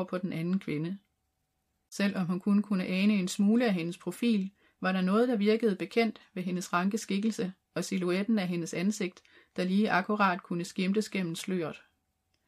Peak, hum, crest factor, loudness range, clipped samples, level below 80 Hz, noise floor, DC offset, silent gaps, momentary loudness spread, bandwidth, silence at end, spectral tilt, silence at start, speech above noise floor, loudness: -12 dBFS; none; 18 dB; 3 LU; under 0.1%; -78 dBFS; -79 dBFS; under 0.1%; none; 10 LU; 14.5 kHz; 0.7 s; -6 dB/octave; 0 s; 50 dB; -30 LUFS